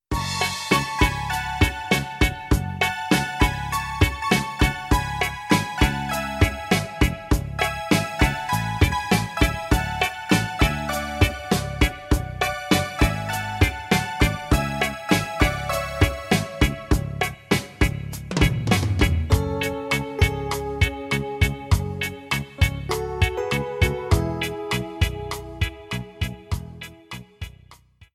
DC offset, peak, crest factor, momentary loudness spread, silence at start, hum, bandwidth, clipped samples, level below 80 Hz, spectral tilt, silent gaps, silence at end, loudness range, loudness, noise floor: under 0.1%; -4 dBFS; 18 dB; 7 LU; 0.1 s; none; 16 kHz; under 0.1%; -30 dBFS; -5 dB/octave; none; 0.1 s; 2 LU; -23 LUFS; -51 dBFS